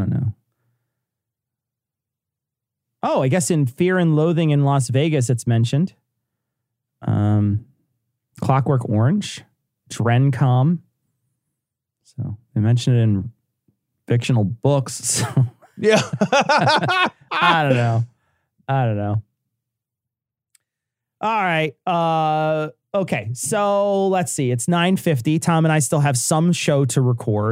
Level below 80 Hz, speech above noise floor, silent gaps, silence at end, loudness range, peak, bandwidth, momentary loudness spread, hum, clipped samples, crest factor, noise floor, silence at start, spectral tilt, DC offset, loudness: -60 dBFS; 68 dB; none; 0 s; 6 LU; 0 dBFS; 16 kHz; 8 LU; none; under 0.1%; 20 dB; -86 dBFS; 0 s; -5.5 dB/octave; under 0.1%; -19 LUFS